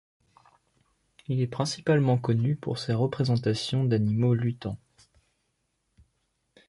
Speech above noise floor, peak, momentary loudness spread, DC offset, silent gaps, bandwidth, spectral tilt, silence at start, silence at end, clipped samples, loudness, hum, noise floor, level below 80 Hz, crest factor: 50 dB; -12 dBFS; 9 LU; under 0.1%; none; 11.5 kHz; -7 dB/octave; 1.3 s; 1.9 s; under 0.1%; -27 LUFS; none; -76 dBFS; -60 dBFS; 16 dB